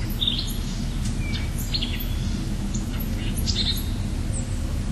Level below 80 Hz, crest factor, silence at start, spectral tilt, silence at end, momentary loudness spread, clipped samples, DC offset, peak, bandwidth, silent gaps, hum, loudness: -28 dBFS; 16 dB; 0 s; -4.5 dB/octave; 0 s; 5 LU; under 0.1%; under 0.1%; -10 dBFS; 13.5 kHz; none; none; -27 LUFS